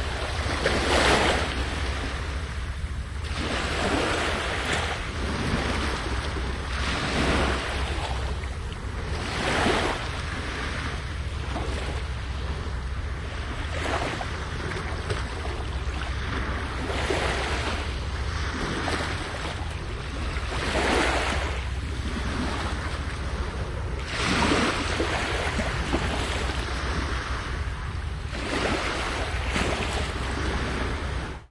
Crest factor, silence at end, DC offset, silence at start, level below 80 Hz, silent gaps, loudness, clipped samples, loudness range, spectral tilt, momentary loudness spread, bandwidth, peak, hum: 18 dB; 0.05 s; under 0.1%; 0 s; -32 dBFS; none; -28 LUFS; under 0.1%; 5 LU; -4.5 dB/octave; 9 LU; 11.5 kHz; -8 dBFS; none